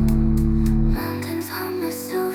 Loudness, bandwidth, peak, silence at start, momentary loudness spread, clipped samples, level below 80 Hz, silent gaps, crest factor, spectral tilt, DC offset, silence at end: -23 LUFS; 18.5 kHz; -8 dBFS; 0 s; 7 LU; under 0.1%; -24 dBFS; none; 12 dB; -7 dB/octave; 0.1%; 0 s